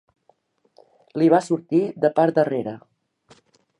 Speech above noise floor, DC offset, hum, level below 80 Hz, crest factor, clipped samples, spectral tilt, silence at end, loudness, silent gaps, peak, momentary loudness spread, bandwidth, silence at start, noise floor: 43 dB; under 0.1%; none; -74 dBFS; 20 dB; under 0.1%; -7.5 dB/octave; 1 s; -20 LUFS; none; -4 dBFS; 16 LU; 11 kHz; 1.15 s; -63 dBFS